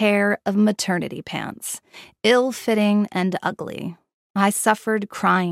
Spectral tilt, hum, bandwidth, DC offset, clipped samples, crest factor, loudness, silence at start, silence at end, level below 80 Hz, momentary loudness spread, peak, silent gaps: -4.5 dB/octave; none; 15.5 kHz; under 0.1%; under 0.1%; 18 dB; -21 LUFS; 0 s; 0 s; -68 dBFS; 12 LU; -2 dBFS; 4.14-4.34 s